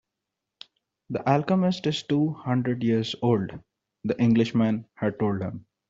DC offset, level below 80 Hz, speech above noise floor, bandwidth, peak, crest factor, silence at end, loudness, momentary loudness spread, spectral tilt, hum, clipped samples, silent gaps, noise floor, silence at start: under 0.1%; -62 dBFS; 61 dB; 7.8 kHz; -6 dBFS; 20 dB; 0.3 s; -25 LUFS; 11 LU; -7.5 dB/octave; none; under 0.1%; none; -85 dBFS; 1.1 s